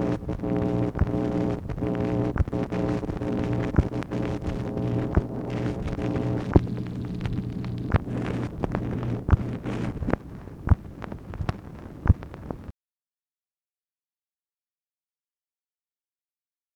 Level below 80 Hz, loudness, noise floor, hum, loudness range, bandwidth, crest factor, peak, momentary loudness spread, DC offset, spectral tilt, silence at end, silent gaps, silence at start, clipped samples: -36 dBFS; -28 LUFS; under -90 dBFS; none; 6 LU; 9.2 kHz; 26 dB; 0 dBFS; 8 LU; under 0.1%; -9 dB/octave; 4.05 s; none; 0 s; under 0.1%